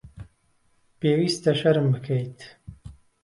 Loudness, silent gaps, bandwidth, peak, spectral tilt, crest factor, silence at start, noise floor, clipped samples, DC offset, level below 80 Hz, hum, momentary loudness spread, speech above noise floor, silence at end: -23 LUFS; none; 11.5 kHz; -8 dBFS; -6.5 dB/octave; 18 dB; 0.05 s; -65 dBFS; under 0.1%; under 0.1%; -54 dBFS; none; 24 LU; 42 dB; 0.3 s